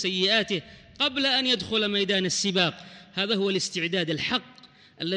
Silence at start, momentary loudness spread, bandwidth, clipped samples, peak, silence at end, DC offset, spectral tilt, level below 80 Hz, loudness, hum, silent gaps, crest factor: 0 s; 8 LU; 10.5 kHz; under 0.1%; -10 dBFS; 0 s; under 0.1%; -3 dB/octave; -62 dBFS; -25 LUFS; none; none; 16 dB